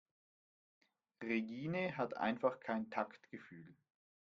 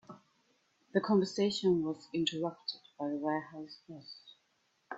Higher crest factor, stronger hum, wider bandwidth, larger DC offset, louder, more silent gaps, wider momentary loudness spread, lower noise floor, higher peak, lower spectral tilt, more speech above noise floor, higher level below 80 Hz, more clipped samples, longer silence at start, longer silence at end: about the same, 22 dB vs 20 dB; neither; second, 7 kHz vs 8 kHz; neither; second, -41 LUFS vs -34 LUFS; neither; about the same, 17 LU vs 19 LU; first, under -90 dBFS vs -76 dBFS; second, -22 dBFS vs -16 dBFS; about the same, -5 dB/octave vs -5.5 dB/octave; first, over 49 dB vs 42 dB; second, -82 dBFS vs -76 dBFS; neither; first, 1.2 s vs 0.1 s; first, 0.5 s vs 0 s